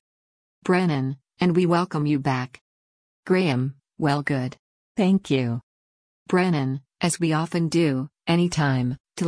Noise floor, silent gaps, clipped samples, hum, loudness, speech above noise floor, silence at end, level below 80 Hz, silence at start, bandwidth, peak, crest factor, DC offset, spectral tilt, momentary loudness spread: under -90 dBFS; 2.61-3.23 s, 4.59-4.95 s, 5.63-6.26 s, 9.00-9.04 s; under 0.1%; none; -24 LUFS; over 68 dB; 0 s; -58 dBFS; 0.65 s; 10.5 kHz; -8 dBFS; 16 dB; under 0.1%; -6 dB/octave; 8 LU